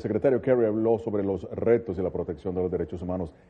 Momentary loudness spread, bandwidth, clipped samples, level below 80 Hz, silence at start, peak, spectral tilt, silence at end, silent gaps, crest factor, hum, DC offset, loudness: 9 LU; 4.5 kHz; under 0.1%; -52 dBFS; 0 s; -10 dBFS; -10 dB/octave; 0.2 s; none; 16 dB; none; under 0.1%; -27 LUFS